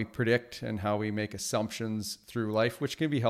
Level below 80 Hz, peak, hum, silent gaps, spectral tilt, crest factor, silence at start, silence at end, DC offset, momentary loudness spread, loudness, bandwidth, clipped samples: -64 dBFS; -12 dBFS; none; none; -5 dB/octave; 18 dB; 0 s; 0 s; under 0.1%; 7 LU; -32 LUFS; 16 kHz; under 0.1%